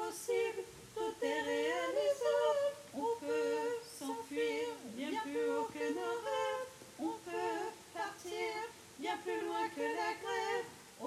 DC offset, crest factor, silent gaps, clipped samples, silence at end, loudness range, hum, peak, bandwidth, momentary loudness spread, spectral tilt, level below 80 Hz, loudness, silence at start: under 0.1%; 16 dB; none; under 0.1%; 0 s; 5 LU; none; -22 dBFS; 15.5 kHz; 9 LU; -3 dB/octave; -78 dBFS; -38 LUFS; 0 s